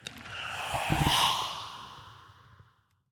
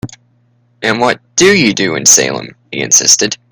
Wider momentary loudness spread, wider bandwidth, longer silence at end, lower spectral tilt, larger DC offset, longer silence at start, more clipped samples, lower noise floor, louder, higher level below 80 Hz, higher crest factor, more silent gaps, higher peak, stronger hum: first, 21 LU vs 15 LU; about the same, 19.5 kHz vs over 20 kHz; first, 0.5 s vs 0.15 s; first, -3 dB/octave vs -1.5 dB/octave; neither; about the same, 0 s vs 0.05 s; second, under 0.1% vs 0.7%; first, -66 dBFS vs -54 dBFS; second, -29 LUFS vs -9 LUFS; about the same, -48 dBFS vs -50 dBFS; first, 20 dB vs 12 dB; neither; second, -14 dBFS vs 0 dBFS; neither